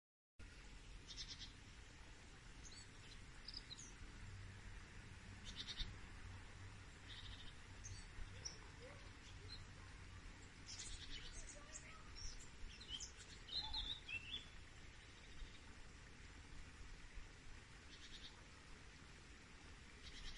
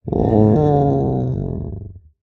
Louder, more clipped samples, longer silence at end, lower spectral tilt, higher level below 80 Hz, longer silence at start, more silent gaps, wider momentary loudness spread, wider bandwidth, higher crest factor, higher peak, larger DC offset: second, -55 LUFS vs -17 LUFS; neither; second, 0 s vs 0.25 s; second, -2.5 dB/octave vs -12 dB/octave; second, -60 dBFS vs -34 dBFS; first, 0.4 s vs 0.05 s; neither; second, 12 LU vs 15 LU; first, 11 kHz vs 5.8 kHz; first, 22 dB vs 16 dB; second, -32 dBFS vs -2 dBFS; neither